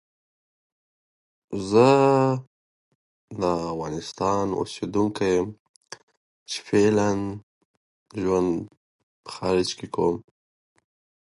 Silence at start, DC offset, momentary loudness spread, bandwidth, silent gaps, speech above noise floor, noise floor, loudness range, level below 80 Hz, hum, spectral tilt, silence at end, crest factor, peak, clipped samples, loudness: 1.5 s; under 0.1%; 21 LU; 11.5 kHz; 2.47-3.28 s, 5.59-5.81 s, 6.03-6.08 s, 6.17-6.46 s, 7.43-8.06 s, 8.77-9.24 s; over 67 dB; under -90 dBFS; 5 LU; -56 dBFS; none; -6 dB/octave; 1.1 s; 22 dB; -4 dBFS; under 0.1%; -24 LUFS